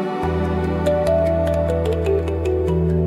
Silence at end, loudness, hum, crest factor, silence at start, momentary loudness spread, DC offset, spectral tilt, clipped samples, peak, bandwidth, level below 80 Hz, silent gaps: 0 s; -20 LUFS; none; 12 dB; 0 s; 3 LU; under 0.1%; -8.5 dB/octave; under 0.1%; -6 dBFS; 13 kHz; -30 dBFS; none